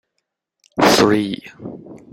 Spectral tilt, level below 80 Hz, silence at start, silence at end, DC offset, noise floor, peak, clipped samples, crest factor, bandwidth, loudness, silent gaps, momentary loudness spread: -4 dB/octave; -52 dBFS; 0.75 s; 0.15 s; under 0.1%; -76 dBFS; 0 dBFS; under 0.1%; 20 dB; 16.5 kHz; -15 LUFS; none; 22 LU